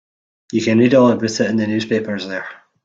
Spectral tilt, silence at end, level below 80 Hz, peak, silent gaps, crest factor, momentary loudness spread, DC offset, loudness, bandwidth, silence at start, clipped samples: -5.5 dB/octave; 0.3 s; -58 dBFS; -2 dBFS; none; 16 dB; 14 LU; under 0.1%; -17 LUFS; 7.8 kHz; 0.55 s; under 0.1%